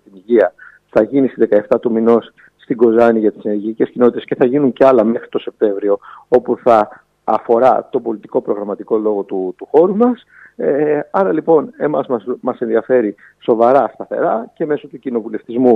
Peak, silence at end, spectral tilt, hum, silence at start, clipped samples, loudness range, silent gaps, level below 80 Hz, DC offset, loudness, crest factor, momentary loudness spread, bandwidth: 0 dBFS; 0 s; -8.5 dB/octave; none; 0.15 s; under 0.1%; 3 LU; none; -60 dBFS; under 0.1%; -15 LUFS; 14 dB; 10 LU; 5.8 kHz